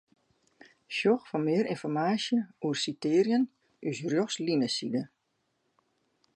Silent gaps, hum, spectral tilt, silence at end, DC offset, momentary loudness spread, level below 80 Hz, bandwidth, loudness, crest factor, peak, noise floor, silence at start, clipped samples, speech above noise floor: none; none; -5 dB/octave; 1.3 s; under 0.1%; 8 LU; -80 dBFS; 11 kHz; -30 LUFS; 18 dB; -14 dBFS; -77 dBFS; 0.9 s; under 0.1%; 49 dB